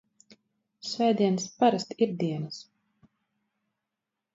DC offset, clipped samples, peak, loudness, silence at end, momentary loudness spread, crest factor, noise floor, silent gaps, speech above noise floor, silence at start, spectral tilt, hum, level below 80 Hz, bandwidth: under 0.1%; under 0.1%; -10 dBFS; -27 LUFS; 1.7 s; 15 LU; 22 dB; -86 dBFS; none; 60 dB; 0.85 s; -5.5 dB/octave; none; -76 dBFS; 7.8 kHz